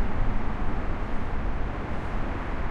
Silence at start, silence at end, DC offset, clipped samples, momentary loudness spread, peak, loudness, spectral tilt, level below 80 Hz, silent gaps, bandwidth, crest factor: 0 s; 0 s; under 0.1%; under 0.1%; 2 LU; -12 dBFS; -33 LUFS; -8 dB/octave; -28 dBFS; none; 4.9 kHz; 12 dB